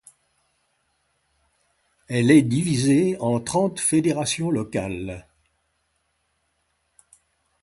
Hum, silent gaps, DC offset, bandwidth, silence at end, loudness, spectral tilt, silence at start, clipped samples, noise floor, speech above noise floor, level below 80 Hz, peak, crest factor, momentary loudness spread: none; none; under 0.1%; 11.5 kHz; 2.4 s; -21 LUFS; -5.5 dB/octave; 2.1 s; under 0.1%; -71 dBFS; 51 dB; -54 dBFS; -4 dBFS; 20 dB; 13 LU